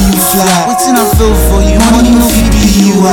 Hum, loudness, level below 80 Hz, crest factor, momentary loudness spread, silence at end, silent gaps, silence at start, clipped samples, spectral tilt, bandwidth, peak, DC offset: none; -7 LUFS; -14 dBFS; 6 dB; 2 LU; 0 s; none; 0 s; 0.2%; -4.5 dB/octave; 20 kHz; 0 dBFS; under 0.1%